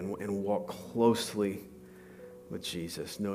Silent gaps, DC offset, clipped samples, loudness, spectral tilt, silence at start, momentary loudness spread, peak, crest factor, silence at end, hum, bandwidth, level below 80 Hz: none; under 0.1%; under 0.1%; -33 LUFS; -5 dB/octave; 0 s; 23 LU; -12 dBFS; 20 dB; 0 s; none; 15.5 kHz; -68 dBFS